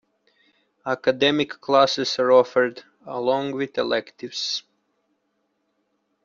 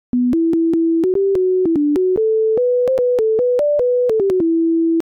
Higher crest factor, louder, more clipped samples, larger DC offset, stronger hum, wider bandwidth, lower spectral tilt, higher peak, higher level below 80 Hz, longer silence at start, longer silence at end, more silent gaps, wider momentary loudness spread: first, 20 dB vs 4 dB; second, -22 LUFS vs -16 LUFS; neither; neither; neither; first, 7.6 kHz vs 4.8 kHz; second, -4 dB/octave vs -9 dB/octave; first, -4 dBFS vs -12 dBFS; second, -68 dBFS vs -52 dBFS; first, 0.85 s vs 0.15 s; first, 1.65 s vs 0.1 s; neither; first, 12 LU vs 0 LU